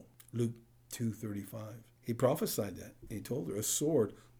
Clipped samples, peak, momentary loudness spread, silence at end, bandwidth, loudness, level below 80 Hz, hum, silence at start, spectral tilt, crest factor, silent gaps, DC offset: under 0.1%; -16 dBFS; 16 LU; 0.2 s; over 20 kHz; -36 LUFS; -66 dBFS; none; 0 s; -5 dB/octave; 20 dB; none; under 0.1%